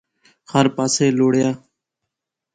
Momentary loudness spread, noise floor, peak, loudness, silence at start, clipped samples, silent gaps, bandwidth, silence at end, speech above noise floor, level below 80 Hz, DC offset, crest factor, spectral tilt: 7 LU; -82 dBFS; -2 dBFS; -18 LUFS; 0.55 s; under 0.1%; none; 9.4 kHz; 1 s; 65 dB; -60 dBFS; under 0.1%; 18 dB; -5 dB/octave